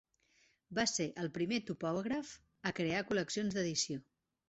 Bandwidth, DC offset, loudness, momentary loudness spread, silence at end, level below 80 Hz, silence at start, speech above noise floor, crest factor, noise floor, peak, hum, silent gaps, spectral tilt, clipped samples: 8 kHz; under 0.1%; -37 LUFS; 7 LU; 0.5 s; -70 dBFS; 0.7 s; 36 dB; 20 dB; -73 dBFS; -20 dBFS; none; none; -4 dB/octave; under 0.1%